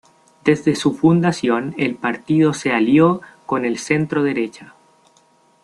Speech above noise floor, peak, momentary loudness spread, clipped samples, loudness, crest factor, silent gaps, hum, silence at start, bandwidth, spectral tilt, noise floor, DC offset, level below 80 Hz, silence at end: 39 dB; -2 dBFS; 9 LU; under 0.1%; -18 LUFS; 16 dB; none; none; 0.45 s; 11.5 kHz; -6.5 dB/octave; -56 dBFS; under 0.1%; -58 dBFS; 1 s